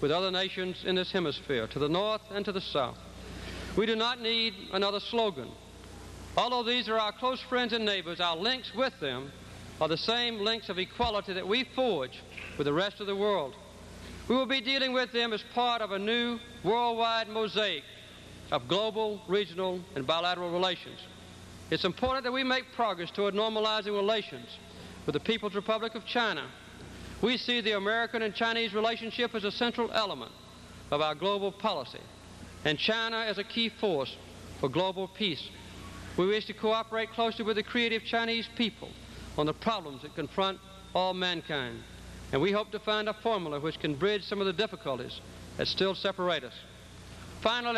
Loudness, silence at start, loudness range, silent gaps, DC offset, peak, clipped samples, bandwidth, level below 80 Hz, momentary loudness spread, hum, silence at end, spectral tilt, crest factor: -31 LUFS; 0 s; 3 LU; none; under 0.1%; -12 dBFS; under 0.1%; 13 kHz; -56 dBFS; 17 LU; none; 0 s; -4.5 dB/octave; 18 dB